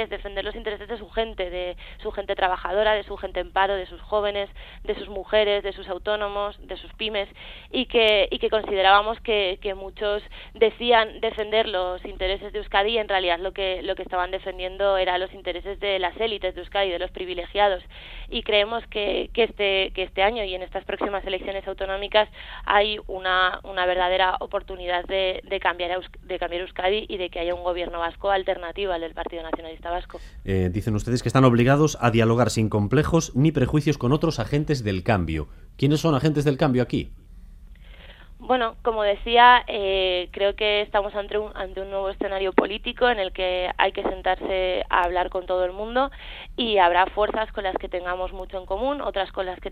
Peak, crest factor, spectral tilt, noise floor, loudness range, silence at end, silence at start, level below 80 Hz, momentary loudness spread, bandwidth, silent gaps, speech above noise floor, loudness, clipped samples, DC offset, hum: -2 dBFS; 22 dB; -5.5 dB/octave; -44 dBFS; 6 LU; 0 s; 0 s; -42 dBFS; 12 LU; 14.5 kHz; none; 20 dB; -24 LUFS; under 0.1%; under 0.1%; none